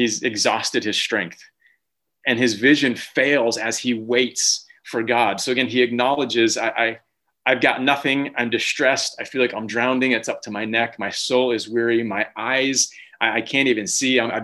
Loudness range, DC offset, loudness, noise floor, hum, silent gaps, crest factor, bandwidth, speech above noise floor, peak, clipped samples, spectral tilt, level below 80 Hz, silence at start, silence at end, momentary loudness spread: 2 LU; under 0.1%; -20 LUFS; -74 dBFS; none; none; 18 dB; 12.5 kHz; 53 dB; -2 dBFS; under 0.1%; -2.5 dB/octave; -66 dBFS; 0 s; 0 s; 7 LU